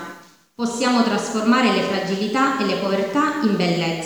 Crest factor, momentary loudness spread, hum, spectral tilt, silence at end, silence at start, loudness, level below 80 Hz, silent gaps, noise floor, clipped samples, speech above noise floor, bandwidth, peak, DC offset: 16 dB; 5 LU; none; -5 dB/octave; 0 s; 0 s; -20 LUFS; -68 dBFS; none; -43 dBFS; under 0.1%; 24 dB; over 20 kHz; -4 dBFS; 0.1%